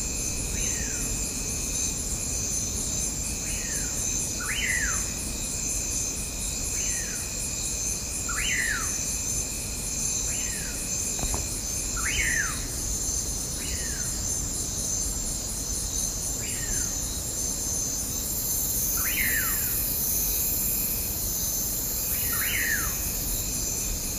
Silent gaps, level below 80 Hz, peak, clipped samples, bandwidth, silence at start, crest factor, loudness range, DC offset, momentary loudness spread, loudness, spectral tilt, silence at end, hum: none; -38 dBFS; -12 dBFS; under 0.1%; 15.5 kHz; 0 s; 16 dB; 3 LU; under 0.1%; 5 LU; -26 LUFS; -1.5 dB/octave; 0 s; none